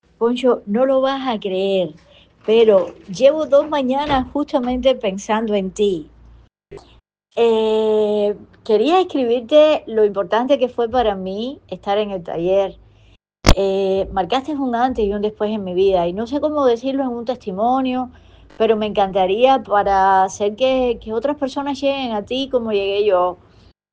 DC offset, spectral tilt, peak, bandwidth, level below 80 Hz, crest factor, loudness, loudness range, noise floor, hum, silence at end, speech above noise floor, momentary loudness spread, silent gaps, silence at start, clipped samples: under 0.1%; -5.5 dB/octave; 0 dBFS; 10 kHz; -36 dBFS; 18 dB; -18 LUFS; 4 LU; -53 dBFS; none; 0.6 s; 35 dB; 8 LU; none; 0.2 s; under 0.1%